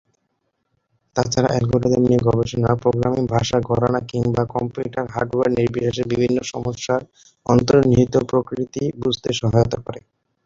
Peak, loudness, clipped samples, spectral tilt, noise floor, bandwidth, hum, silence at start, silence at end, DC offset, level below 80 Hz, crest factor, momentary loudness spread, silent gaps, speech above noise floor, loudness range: -2 dBFS; -20 LUFS; under 0.1%; -6.5 dB/octave; -71 dBFS; 7.6 kHz; none; 1.15 s; 0.45 s; under 0.1%; -44 dBFS; 18 dB; 9 LU; none; 53 dB; 3 LU